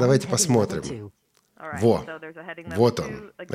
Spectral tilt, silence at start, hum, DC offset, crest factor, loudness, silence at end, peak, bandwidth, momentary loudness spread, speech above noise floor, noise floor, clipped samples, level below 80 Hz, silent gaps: -5 dB/octave; 0 s; none; under 0.1%; 18 dB; -23 LUFS; 0 s; -6 dBFS; 15.5 kHz; 18 LU; 23 dB; -47 dBFS; under 0.1%; -54 dBFS; none